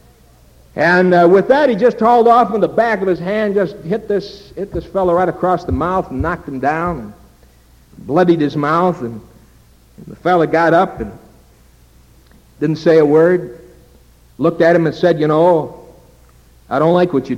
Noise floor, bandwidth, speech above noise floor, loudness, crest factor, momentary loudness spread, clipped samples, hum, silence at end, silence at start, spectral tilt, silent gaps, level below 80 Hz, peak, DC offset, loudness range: -47 dBFS; 12.5 kHz; 33 dB; -14 LUFS; 14 dB; 15 LU; under 0.1%; none; 0 s; 0.75 s; -7.5 dB/octave; none; -42 dBFS; 0 dBFS; under 0.1%; 6 LU